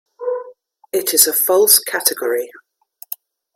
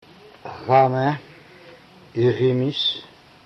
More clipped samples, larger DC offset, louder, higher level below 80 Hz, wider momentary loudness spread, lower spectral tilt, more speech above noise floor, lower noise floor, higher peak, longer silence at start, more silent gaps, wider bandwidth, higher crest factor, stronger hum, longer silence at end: neither; neither; first, -14 LUFS vs -20 LUFS; second, -70 dBFS vs -62 dBFS; first, 20 LU vs 17 LU; second, 0.5 dB/octave vs -7.5 dB/octave; about the same, 30 dB vs 27 dB; about the same, -46 dBFS vs -47 dBFS; first, 0 dBFS vs -4 dBFS; second, 0.2 s vs 0.45 s; neither; first, 17 kHz vs 6.4 kHz; about the same, 18 dB vs 18 dB; neither; first, 1.05 s vs 0.4 s